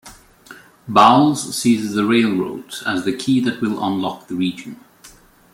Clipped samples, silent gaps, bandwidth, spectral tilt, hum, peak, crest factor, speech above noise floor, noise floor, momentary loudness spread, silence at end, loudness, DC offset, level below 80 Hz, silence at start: under 0.1%; none; 16.5 kHz; -5 dB/octave; none; 0 dBFS; 18 dB; 29 dB; -47 dBFS; 14 LU; 0.45 s; -18 LUFS; under 0.1%; -58 dBFS; 0.05 s